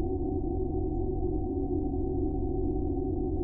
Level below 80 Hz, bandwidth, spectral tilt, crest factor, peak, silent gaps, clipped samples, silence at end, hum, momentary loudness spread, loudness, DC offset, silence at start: -36 dBFS; 1.1 kHz; -16 dB/octave; 10 dB; -18 dBFS; none; under 0.1%; 0 s; none; 1 LU; -32 LUFS; under 0.1%; 0 s